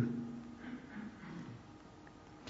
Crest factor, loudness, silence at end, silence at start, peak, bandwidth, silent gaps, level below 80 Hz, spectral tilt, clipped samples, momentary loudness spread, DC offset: 22 dB; -48 LUFS; 0 s; 0 s; -24 dBFS; 7.6 kHz; none; -68 dBFS; -6.5 dB/octave; under 0.1%; 13 LU; under 0.1%